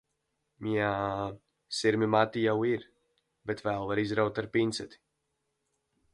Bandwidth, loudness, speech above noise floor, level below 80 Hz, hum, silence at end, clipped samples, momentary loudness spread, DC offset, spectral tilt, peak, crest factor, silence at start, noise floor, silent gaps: 11.5 kHz; -30 LUFS; 51 dB; -62 dBFS; none; 1.2 s; under 0.1%; 13 LU; under 0.1%; -5.5 dB/octave; -10 dBFS; 22 dB; 0.6 s; -81 dBFS; none